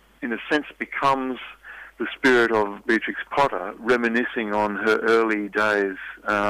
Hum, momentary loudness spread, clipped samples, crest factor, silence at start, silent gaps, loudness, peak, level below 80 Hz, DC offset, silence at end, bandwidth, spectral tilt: none; 12 LU; under 0.1%; 12 dB; 0.2 s; none; -22 LUFS; -10 dBFS; -58 dBFS; under 0.1%; 0 s; 15 kHz; -5 dB/octave